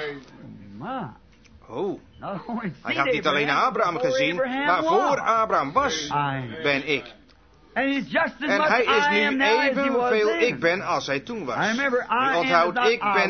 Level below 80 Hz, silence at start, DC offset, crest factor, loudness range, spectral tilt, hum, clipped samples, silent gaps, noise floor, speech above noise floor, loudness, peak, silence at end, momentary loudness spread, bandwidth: -58 dBFS; 0 s; under 0.1%; 20 dB; 4 LU; -4.5 dB/octave; none; under 0.1%; none; -54 dBFS; 32 dB; -22 LUFS; -4 dBFS; 0 s; 13 LU; 6.6 kHz